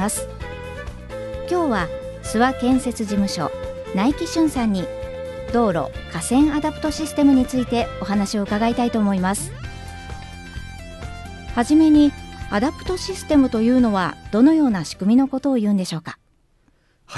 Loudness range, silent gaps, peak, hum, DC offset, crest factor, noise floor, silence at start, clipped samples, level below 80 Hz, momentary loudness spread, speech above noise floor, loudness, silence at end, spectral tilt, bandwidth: 5 LU; none; -4 dBFS; none; under 0.1%; 16 dB; -60 dBFS; 0 s; under 0.1%; -38 dBFS; 18 LU; 41 dB; -20 LUFS; 0 s; -5.5 dB/octave; 12.5 kHz